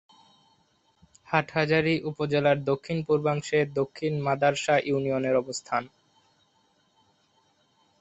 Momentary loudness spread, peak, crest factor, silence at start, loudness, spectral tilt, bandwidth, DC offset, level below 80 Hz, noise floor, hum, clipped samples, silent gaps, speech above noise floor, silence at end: 6 LU; -6 dBFS; 22 dB; 1.3 s; -26 LUFS; -5.5 dB/octave; 8.4 kHz; under 0.1%; -64 dBFS; -67 dBFS; none; under 0.1%; none; 42 dB; 2.15 s